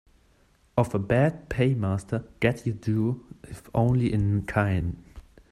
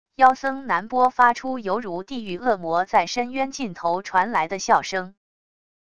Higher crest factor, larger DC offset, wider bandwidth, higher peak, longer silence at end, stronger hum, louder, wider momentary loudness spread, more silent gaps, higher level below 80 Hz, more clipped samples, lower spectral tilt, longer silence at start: about the same, 20 dB vs 20 dB; second, under 0.1% vs 0.6%; first, 12.5 kHz vs 10 kHz; second, -8 dBFS vs -2 dBFS; second, 0.3 s vs 0.7 s; neither; second, -26 LUFS vs -22 LUFS; about the same, 10 LU vs 11 LU; neither; first, -46 dBFS vs -60 dBFS; neither; first, -8 dB/octave vs -3.5 dB/octave; first, 0.75 s vs 0.05 s